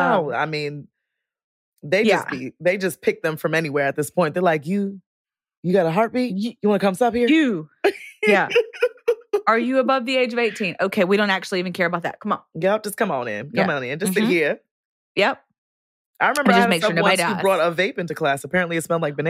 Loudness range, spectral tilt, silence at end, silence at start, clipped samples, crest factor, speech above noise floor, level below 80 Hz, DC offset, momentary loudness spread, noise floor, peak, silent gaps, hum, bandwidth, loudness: 3 LU; -5 dB/octave; 0 s; 0 s; under 0.1%; 20 dB; 61 dB; -66 dBFS; under 0.1%; 8 LU; -81 dBFS; -2 dBFS; 1.44-1.77 s, 5.06-5.25 s, 5.57-5.63 s, 14.71-15.15 s, 15.58-16.14 s; none; 16 kHz; -21 LUFS